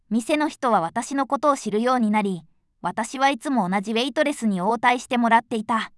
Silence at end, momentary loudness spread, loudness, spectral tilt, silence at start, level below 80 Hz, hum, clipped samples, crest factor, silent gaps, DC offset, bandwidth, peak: 0.1 s; 7 LU; -22 LUFS; -4.5 dB/octave; 0.1 s; -66 dBFS; none; under 0.1%; 18 dB; none; under 0.1%; 12 kHz; -4 dBFS